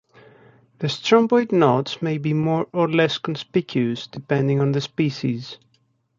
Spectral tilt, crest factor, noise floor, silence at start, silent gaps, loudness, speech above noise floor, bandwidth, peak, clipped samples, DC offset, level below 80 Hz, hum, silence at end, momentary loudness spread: -6.5 dB/octave; 20 dB; -65 dBFS; 0.8 s; none; -21 LUFS; 45 dB; 7.6 kHz; -2 dBFS; under 0.1%; under 0.1%; -62 dBFS; none; 0.65 s; 9 LU